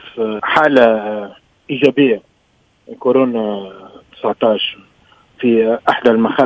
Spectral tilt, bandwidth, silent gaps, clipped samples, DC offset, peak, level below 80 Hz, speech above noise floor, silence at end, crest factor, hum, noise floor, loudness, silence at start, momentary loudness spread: -6.5 dB/octave; 8 kHz; none; 0.2%; under 0.1%; 0 dBFS; -58 dBFS; 43 dB; 0 s; 16 dB; none; -57 dBFS; -15 LUFS; 0.05 s; 13 LU